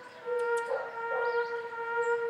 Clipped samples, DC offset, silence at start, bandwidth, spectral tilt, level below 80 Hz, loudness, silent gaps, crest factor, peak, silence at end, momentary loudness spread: under 0.1%; under 0.1%; 0 s; 11.5 kHz; -2.5 dB/octave; -82 dBFS; -32 LUFS; none; 12 dB; -20 dBFS; 0 s; 5 LU